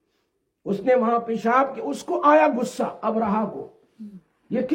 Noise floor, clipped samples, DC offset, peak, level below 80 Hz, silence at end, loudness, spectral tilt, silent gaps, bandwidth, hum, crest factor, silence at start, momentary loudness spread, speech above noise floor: -73 dBFS; under 0.1%; under 0.1%; -6 dBFS; -68 dBFS; 0 s; -22 LUFS; -6 dB/octave; none; 16.5 kHz; none; 18 dB; 0.65 s; 21 LU; 51 dB